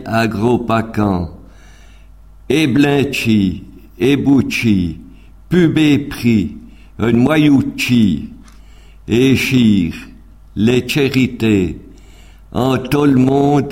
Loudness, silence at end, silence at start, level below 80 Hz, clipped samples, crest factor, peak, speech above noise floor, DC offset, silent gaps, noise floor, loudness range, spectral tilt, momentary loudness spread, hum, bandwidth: -14 LUFS; 0 s; 0 s; -38 dBFS; under 0.1%; 14 dB; 0 dBFS; 27 dB; 0.3%; none; -40 dBFS; 3 LU; -6.5 dB/octave; 12 LU; none; 16.5 kHz